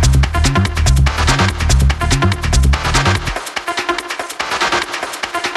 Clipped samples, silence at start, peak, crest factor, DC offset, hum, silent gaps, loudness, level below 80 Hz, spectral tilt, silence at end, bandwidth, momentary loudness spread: under 0.1%; 0 s; 0 dBFS; 14 dB; under 0.1%; none; none; -15 LUFS; -18 dBFS; -4 dB/octave; 0 s; 13 kHz; 7 LU